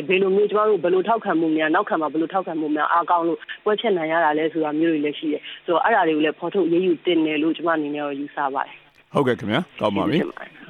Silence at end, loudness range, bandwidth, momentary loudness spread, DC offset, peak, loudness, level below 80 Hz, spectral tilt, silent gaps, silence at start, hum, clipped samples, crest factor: 0.05 s; 3 LU; 4.6 kHz; 7 LU; under 0.1%; -4 dBFS; -21 LUFS; -68 dBFS; -7.5 dB/octave; none; 0 s; none; under 0.1%; 16 dB